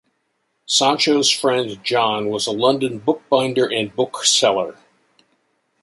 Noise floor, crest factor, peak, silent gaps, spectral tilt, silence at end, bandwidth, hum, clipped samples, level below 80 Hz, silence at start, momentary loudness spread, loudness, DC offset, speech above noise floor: -70 dBFS; 18 dB; -2 dBFS; none; -2.5 dB/octave; 1.1 s; 11.5 kHz; none; under 0.1%; -64 dBFS; 0.7 s; 7 LU; -18 LUFS; under 0.1%; 52 dB